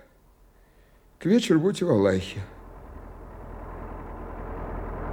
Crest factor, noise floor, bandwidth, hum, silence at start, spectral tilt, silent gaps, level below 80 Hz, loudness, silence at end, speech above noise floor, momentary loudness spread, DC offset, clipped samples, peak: 18 dB; -57 dBFS; 16.5 kHz; none; 1.2 s; -6.5 dB/octave; none; -42 dBFS; -25 LUFS; 0 s; 34 dB; 23 LU; under 0.1%; under 0.1%; -10 dBFS